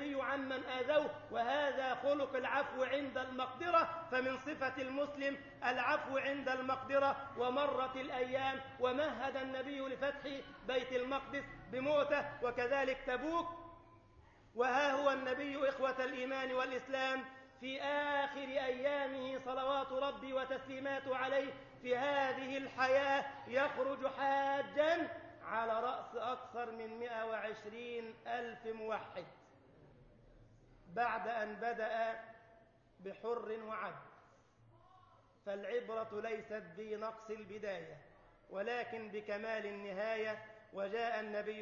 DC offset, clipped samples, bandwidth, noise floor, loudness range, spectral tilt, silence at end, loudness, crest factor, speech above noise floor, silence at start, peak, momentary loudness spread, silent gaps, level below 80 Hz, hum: under 0.1%; under 0.1%; 7 kHz; -67 dBFS; 8 LU; -1.5 dB/octave; 0 s; -39 LUFS; 20 dB; 28 dB; 0 s; -20 dBFS; 11 LU; none; -72 dBFS; none